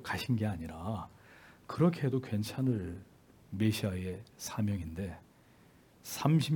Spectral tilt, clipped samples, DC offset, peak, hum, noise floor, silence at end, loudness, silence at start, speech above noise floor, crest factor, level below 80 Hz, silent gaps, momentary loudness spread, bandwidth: -6.5 dB/octave; under 0.1%; under 0.1%; -14 dBFS; none; -62 dBFS; 0 s; -35 LUFS; 0 s; 29 dB; 22 dB; -62 dBFS; none; 16 LU; 18 kHz